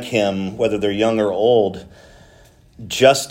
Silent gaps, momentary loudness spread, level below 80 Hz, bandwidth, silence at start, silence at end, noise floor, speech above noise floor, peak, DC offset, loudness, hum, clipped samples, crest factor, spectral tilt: none; 9 LU; -52 dBFS; 16.5 kHz; 0 s; 0 s; -49 dBFS; 31 dB; 0 dBFS; under 0.1%; -18 LUFS; none; under 0.1%; 18 dB; -4.5 dB/octave